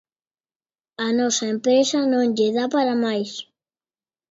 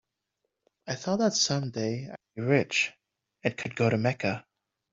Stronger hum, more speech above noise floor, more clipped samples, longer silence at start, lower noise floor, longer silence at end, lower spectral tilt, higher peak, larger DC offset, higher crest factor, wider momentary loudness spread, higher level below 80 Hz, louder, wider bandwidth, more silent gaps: neither; first, over 70 dB vs 54 dB; neither; first, 1 s vs 0.85 s; first, under -90 dBFS vs -82 dBFS; first, 0.9 s vs 0.5 s; about the same, -3.5 dB/octave vs -4.5 dB/octave; about the same, -8 dBFS vs -8 dBFS; neither; second, 14 dB vs 22 dB; second, 9 LU vs 13 LU; about the same, -72 dBFS vs -68 dBFS; first, -21 LUFS vs -28 LUFS; about the same, 7.8 kHz vs 7.8 kHz; neither